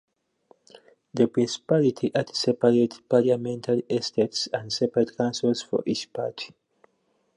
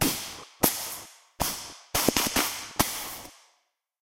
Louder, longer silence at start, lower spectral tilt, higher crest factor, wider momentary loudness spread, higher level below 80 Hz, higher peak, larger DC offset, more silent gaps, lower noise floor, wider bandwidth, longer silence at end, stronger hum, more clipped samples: about the same, -25 LUFS vs -27 LUFS; first, 1.15 s vs 0 s; first, -5.5 dB/octave vs -2 dB/octave; second, 20 dB vs 28 dB; second, 9 LU vs 16 LU; second, -70 dBFS vs -48 dBFS; second, -6 dBFS vs -2 dBFS; neither; neither; about the same, -70 dBFS vs -73 dBFS; second, 11 kHz vs 16 kHz; first, 0.9 s vs 0.65 s; neither; neither